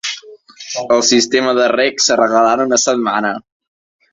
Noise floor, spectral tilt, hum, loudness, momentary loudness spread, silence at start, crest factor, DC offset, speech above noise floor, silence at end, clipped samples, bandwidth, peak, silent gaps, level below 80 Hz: -37 dBFS; -1.5 dB/octave; none; -13 LUFS; 13 LU; 0.05 s; 14 dB; under 0.1%; 24 dB; 0.7 s; under 0.1%; 8 kHz; 0 dBFS; none; -58 dBFS